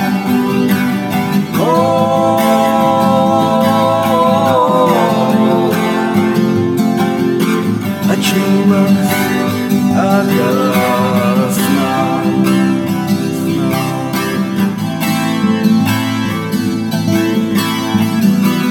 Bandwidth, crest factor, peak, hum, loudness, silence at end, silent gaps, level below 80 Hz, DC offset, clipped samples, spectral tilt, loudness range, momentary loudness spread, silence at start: over 20 kHz; 12 dB; 0 dBFS; none; -13 LUFS; 0 s; none; -56 dBFS; under 0.1%; under 0.1%; -6 dB/octave; 3 LU; 5 LU; 0 s